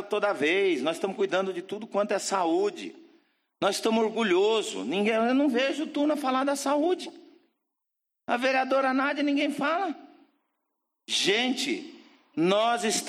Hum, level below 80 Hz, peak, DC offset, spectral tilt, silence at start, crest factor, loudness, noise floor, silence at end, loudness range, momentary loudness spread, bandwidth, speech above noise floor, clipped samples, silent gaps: none; -80 dBFS; -10 dBFS; under 0.1%; -3.5 dB/octave; 0 s; 18 dB; -26 LUFS; -84 dBFS; 0 s; 3 LU; 9 LU; 15 kHz; 58 dB; under 0.1%; none